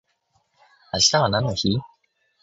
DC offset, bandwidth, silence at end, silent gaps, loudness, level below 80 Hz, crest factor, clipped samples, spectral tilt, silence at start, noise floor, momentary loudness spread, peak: under 0.1%; 8 kHz; 0.55 s; none; -20 LUFS; -50 dBFS; 20 dB; under 0.1%; -3.5 dB/octave; 0.95 s; -68 dBFS; 11 LU; -4 dBFS